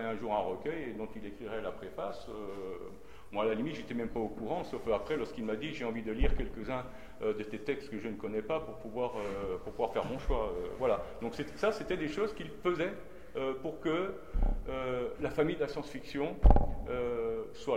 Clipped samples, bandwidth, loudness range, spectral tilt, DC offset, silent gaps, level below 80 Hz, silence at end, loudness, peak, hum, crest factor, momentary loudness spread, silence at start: under 0.1%; 11 kHz; 5 LU; -7 dB/octave; 0.4%; none; -38 dBFS; 0 s; -36 LUFS; -8 dBFS; none; 26 dB; 9 LU; 0 s